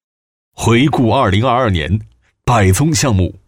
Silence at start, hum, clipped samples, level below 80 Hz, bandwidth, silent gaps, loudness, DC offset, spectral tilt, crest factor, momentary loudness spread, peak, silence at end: 0.6 s; none; under 0.1%; -34 dBFS; 16.5 kHz; none; -14 LUFS; under 0.1%; -5.5 dB/octave; 12 dB; 8 LU; -2 dBFS; 0.15 s